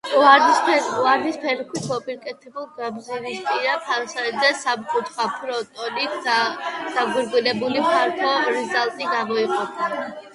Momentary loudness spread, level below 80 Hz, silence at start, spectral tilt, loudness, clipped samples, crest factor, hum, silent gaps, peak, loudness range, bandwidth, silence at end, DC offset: 11 LU; -70 dBFS; 0.05 s; -3 dB/octave; -21 LUFS; under 0.1%; 20 dB; none; none; 0 dBFS; 3 LU; 11.5 kHz; 0.05 s; under 0.1%